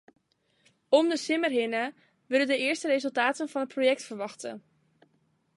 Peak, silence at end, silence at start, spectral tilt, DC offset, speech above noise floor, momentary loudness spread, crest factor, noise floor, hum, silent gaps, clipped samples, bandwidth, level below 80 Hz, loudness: -8 dBFS; 0.95 s; 0.9 s; -3 dB/octave; under 0.1%; 43 dB; 12 LU; 20 dB; -71 dBFS; none; none; under 0.1%; 11.5 kHz; -84 dBFS; -27 LUFS